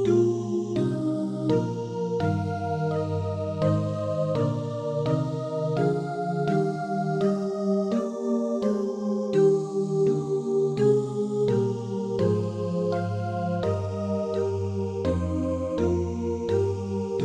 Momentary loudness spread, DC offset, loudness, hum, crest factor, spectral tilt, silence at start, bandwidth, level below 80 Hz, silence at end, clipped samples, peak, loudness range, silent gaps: 6 LU; under 0.1%; -26 LUFS; none; 14 dB; -8.5 dB/octave; 0 s; 9.8 kHz; -52 dBFS; 0 s; under 0.1%; -10 dBFS; 3 LU; none